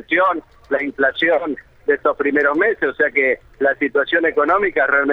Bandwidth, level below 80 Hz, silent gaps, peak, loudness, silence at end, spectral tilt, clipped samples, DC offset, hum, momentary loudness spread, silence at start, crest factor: 5.4 kHz; -52 dBFS; none; -4 dBFS; -17 LUFS; 0 s; -6 dB/octave; under 0.1%; under 0.1%; none; 7 LU; 0.1 s; 14 dB